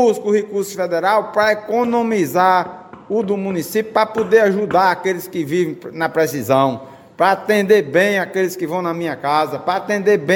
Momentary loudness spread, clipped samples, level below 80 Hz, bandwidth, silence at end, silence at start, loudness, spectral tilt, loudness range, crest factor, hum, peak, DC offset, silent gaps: 8 LU; under 0.1%; -62 dBFS; 17 kHz; 0 s; 0 s; -17 LUFS; -5 dB/octave; 1 LU; 16 dB; none; 0 dBFS; under 0.1%; none